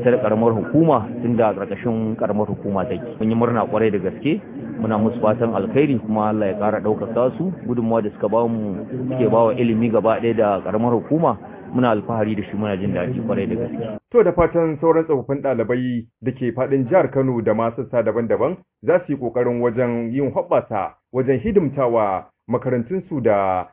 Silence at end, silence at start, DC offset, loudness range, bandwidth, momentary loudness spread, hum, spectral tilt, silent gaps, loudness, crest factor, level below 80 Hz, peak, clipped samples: 0.05 s; 0 s; under 0.1%; 2 LU; 3.8 kHz; 8 LU; none; -12 dB/octave; none; -20 LUFS; 16 dB; -48 dBFS; -4 dBFS; under 0.1%